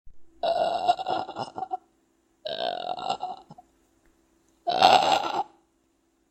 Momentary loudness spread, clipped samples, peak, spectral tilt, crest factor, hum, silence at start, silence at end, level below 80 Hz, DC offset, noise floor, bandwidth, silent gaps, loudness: 19 LU; under 0.1%; 0 dBFS; -2.5 dB/octave; 28 dB; none; 0.05 s; 0.85 s; -64 dBFS; under 0.1%; -69 dBFS; 14 kHz; none; -26 LUFS